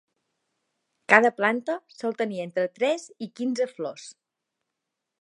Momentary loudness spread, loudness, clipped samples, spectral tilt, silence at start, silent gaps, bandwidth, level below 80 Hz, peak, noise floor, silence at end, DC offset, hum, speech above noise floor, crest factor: 19 LU; -25 LUFS; under 0.1%; -4.5 dB/octave; 1.1 s; none; 11 kHz; -82 dBFS; 0 dBFS; -84 dBFS; 1.1 s; under 0.1%; none; 59 dB; 26 dB